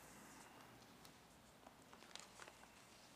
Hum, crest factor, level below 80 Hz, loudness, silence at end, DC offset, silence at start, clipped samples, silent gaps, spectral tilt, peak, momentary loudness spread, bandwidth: none; 26 dB; -82 dBFS; -61 LUFS; 0 s; under 0.1%; 0 s; under 0.1%; none; -2.5 dB/octave; -36 dBFS; 7 LU; 15.5 kHz